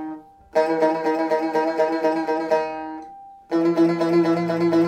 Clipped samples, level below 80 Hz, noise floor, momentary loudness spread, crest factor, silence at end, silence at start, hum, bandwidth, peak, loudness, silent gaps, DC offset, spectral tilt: under 0.1%; -64 dBFS; -42 dBFS; 15 LU; 14 dB; 0 s; 0 s; none; 8.8 kHz; -6 dBFS; -21 LUFS; none; under 0.1%; -7 dB/octave